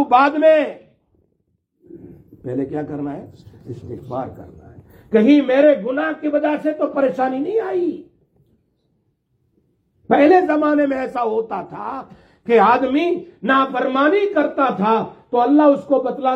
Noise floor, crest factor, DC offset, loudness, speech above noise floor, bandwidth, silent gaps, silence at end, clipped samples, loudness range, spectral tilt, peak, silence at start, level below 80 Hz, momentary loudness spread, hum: -68 dBFS; 16 dB; under 0.1%; -17 LUFS; 51 dB; 6.2 kHz; none; 0 s; under 0.1%; 13 LU; -7.5 dB/octave; -2 dBFS; 0 s; -60 dBFS; 16 LU; none